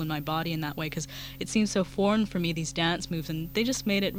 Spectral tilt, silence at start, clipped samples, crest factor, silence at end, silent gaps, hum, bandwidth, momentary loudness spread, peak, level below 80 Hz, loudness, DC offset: -4.5 dB/octave; 0 s; under 0.1%; 16 dB; 0 s; none; none; 16.5 kHz; 7 LU; -12 dBFS; -50 dBFS; -29 LUFS; under 0.1%